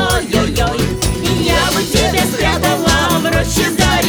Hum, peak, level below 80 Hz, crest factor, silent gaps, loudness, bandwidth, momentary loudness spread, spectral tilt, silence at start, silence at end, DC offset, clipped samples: none; 0 dBFS; -24 dBFS; 14 dB; none; -14 LUFS; over 20 kHz; 3 LU; -4 dB/octave; 0 s; 0 s; under 0.1%; under 0.1%